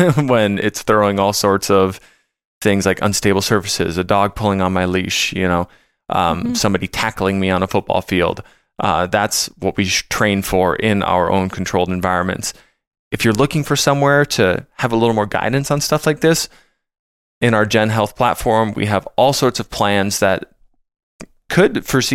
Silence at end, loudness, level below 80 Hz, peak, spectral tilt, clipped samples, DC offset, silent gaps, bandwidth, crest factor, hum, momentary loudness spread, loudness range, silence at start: 0 s; -16 LUFS; -42 dBFS; -2 dBFS; -4.5 dB/octave; under 0.1%; under 0.1%; 2.45-2.61 s, 12.87-12.91 s, 12.99-13.11 s, 16.99-17.41 s, 21.03-21.19 s; 17 kHz; 16 dB; none; 5 LU; 2 LU; 0 s